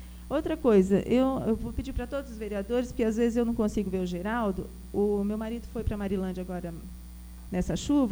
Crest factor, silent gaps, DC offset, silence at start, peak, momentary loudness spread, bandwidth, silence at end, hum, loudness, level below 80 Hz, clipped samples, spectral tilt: 18 dB; none; under 0.1%; 0 s; -10 dBFS; 12 LU; over 20 kHz; 0 s; 60 Hz at -45 dBFS; -29 LUFS; -42 dBFS; under 0.1%; -7 dB/octave